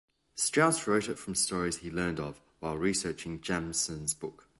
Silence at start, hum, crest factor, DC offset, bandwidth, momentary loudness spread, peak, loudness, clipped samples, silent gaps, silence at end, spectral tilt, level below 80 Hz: 0.35 s; none; 20 dB; under 0.1%; 12 kHz; 12 LU; -12 dBFS; -31 LUFS; under 0.1%; none; 0.3 s; -3.5 dB/octave; -56 dBFS